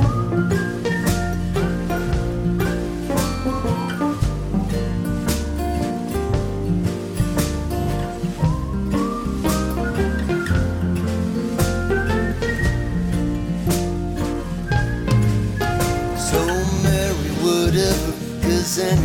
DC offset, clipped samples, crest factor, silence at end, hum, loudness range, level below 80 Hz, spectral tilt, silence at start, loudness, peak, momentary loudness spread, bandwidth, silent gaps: under 0.1%; under 0.1%; 14 dB; 0 s; none; 3 LU; -28 dBFS; -6 dB/octave; 0 s; -21 LUFS; -6 dBFS; 5 LU; 18 kHz; none